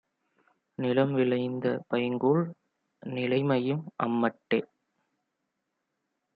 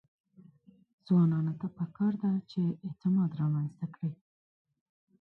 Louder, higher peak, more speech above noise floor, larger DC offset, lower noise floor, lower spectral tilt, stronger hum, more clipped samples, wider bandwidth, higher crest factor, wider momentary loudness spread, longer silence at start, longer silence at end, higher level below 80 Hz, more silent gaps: about the same, -29 LUFS vs -31 LUFS; first, -10 dBFS vs -18 dBFS; first, 54 dB vs 30 dB; neither; first, -82 dBFS vs -60 dBFS; about the same, -10.5 dB/octave vs -11 dB/octave; neither; neither; first, 5 kHz vs 4.5 kHz; first, 20 dB vs 14 dB; second, 8 LU vs 11 LU; second, 0.8 s vs 1.1 s; first, 1.7 s vs 1.05 s; about the same, -76 dBFS vs -74 dBFS; neither